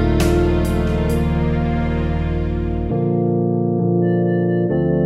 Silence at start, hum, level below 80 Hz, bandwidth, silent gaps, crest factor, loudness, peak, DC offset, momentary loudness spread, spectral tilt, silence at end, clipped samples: 0 s; 60 Hz at -50 dBFS; -24 dBFS; 14.5 kHz; none; 12 dB; -19 LUFS; -6 dBFS; under 0.1%; 5 LU; -8 dB/octave; 0 s; under 0.1%